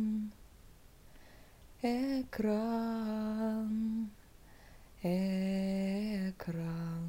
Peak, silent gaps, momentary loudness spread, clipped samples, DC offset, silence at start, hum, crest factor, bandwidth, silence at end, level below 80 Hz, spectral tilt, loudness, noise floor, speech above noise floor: -22 dBFS; none; 6 LU; under 0.1%; under 0.1%; 0 s; none; 14 dB; 16 kHz; 0 s; -60 dBFS; -7.5 dB/octave; -36 LUFS; -57 dBFS; 23 dB